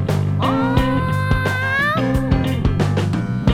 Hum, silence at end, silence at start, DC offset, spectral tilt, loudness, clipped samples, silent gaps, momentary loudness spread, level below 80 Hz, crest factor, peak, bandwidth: none; 0 s; 0 s; under 0.1%; -7 dB/octave; -18 LUFS; under 0.1%; none; 2 LU; -28 dBFS; 18 dB; 0 dBFS; 15.5 kHz